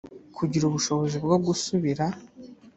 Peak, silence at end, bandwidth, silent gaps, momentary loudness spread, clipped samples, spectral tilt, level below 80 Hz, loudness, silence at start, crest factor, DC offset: -8 dBFS; 0.1 s; 8.4 kHz; none; 8 LU; under 0.1%; -5.5 dB/octave; -60 dBFS; -26 LUFS; 0.1 s; 18 dB; under 0.1%